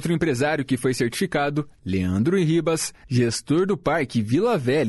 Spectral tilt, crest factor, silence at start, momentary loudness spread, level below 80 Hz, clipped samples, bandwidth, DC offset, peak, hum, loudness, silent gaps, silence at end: -5.5 dB/octave; 12 dB; 0 s; 5 LU; -52 dBFS; under 0.1%; 12 kHz; under 0.1%; -10 dBFS; none; -23 LUFS; none; 0 s